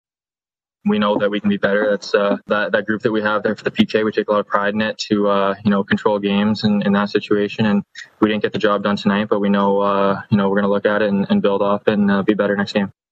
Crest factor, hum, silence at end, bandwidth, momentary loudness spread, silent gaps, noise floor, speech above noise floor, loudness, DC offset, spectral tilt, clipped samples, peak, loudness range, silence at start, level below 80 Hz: 18 dB; none; 0.2 s; 7.6 kHz; 3 LU; none; under -90 dBFS; over 73 dB; -18 LUFS; under 0.1%; -7 dB/octave; under 0.1%; 0 dBFS; 1 LU; 0.85 s; -58 dBFS